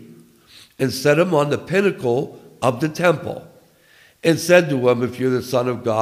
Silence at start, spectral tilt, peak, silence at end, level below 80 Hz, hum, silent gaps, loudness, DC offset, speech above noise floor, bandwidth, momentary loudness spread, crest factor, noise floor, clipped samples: 0 s; -5.5 dB/octave; -2 dBFS; 0 s; -60 dBFS; none; none; -19 LUFS; under 0.1%; 34 dB; 16 kHz; 9 LU; 18 dB; -53 dBFS; under 0.1%